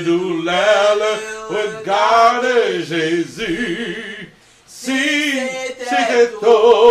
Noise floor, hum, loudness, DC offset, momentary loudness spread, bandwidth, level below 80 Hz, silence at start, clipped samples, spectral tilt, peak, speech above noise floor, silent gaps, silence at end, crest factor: -45 dBFS; none; -16 LUFS; under 0.1%; 12 LU; 14 kHz; -54 dBFS; 0 s; under 0.1%; -3.5 dB/octave; 0 dBFS; 29 dB; none; 0 s; 16 dB